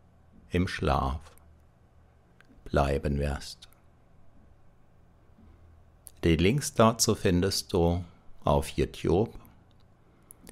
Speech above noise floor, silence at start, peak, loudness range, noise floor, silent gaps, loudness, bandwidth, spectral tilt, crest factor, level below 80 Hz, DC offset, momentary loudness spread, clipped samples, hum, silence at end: 33 dB; 0.5 s; -10 dBFS; 8 LU; -59 dBFS; none; -28 LUFS; 16 kHz; -5 dB/octave; 20 dB; -42 dBFS; under 0.1%; 11 LU; under 0.1%; none; 1.15 s